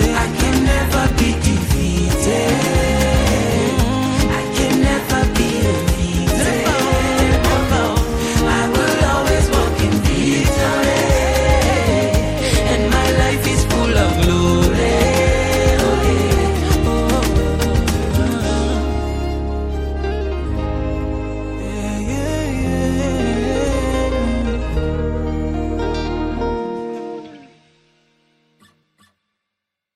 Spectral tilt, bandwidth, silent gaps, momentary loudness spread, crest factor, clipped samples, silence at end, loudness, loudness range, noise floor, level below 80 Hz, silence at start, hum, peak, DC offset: -5 dB/octave; 16 kHz; none; 7 LU; 14 dB; under 0.1%; 2.55 s; -17 LUFS; 8 LU; -81 dBFS; -22 dBFS; 0 s; none; -2 dBFS; under 0.1%